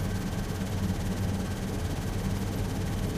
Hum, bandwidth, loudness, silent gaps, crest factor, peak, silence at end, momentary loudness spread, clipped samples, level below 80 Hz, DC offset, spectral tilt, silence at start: none; 15.5 kHz; -32 LUFS; none; 12 dB; -18 dBFS; 0 s; 2 LU; under 0.1%; -38 dBFS; under 0.1%; -6 dB/octave; 0 s